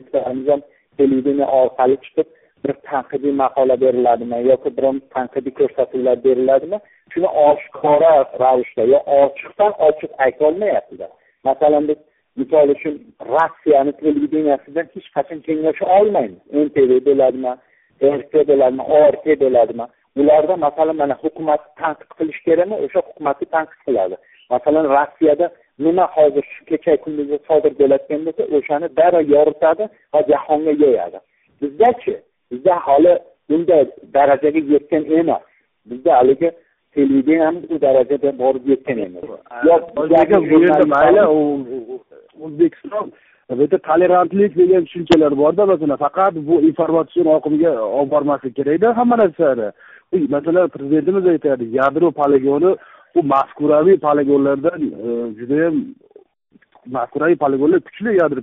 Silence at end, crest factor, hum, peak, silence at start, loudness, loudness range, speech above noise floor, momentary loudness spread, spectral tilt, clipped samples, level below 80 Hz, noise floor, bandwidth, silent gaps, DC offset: 0 s; 14 dB; none; -2 dBFS; 0.15 s; -16 LUFS; 3 LU; 40 dB; 11 LU; -5.5 dB/octave; under 0.1%; -56 dBFS; -56 dBFS; 4 kHz; none; under 0.1%